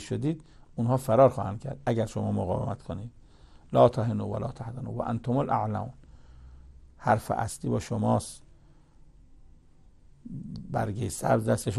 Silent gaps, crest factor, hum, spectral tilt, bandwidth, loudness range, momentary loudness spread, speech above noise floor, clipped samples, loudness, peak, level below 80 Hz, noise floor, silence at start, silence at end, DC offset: none; 22 dB; none; -7 dB/octave; 13 kHz; 6 LU; 18 LU; 28 dB; under 0.1%; -28 LUFS; -8 dBFS; -52 dBFS; -55 dBFS; 0 s; 0 s; under 0.1%